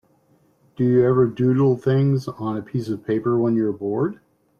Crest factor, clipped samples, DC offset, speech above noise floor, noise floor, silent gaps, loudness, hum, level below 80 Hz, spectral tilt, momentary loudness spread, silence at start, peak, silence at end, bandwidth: 14 dB; under 0.1%; under 0.1%; 40 dB; -60 dBFS; none; -21 LUFS; none; -60 dBFS; -9.5 dB/octave; 9 LU; 0.8 s; -6 dBFS; 0.45 s; 7 kHz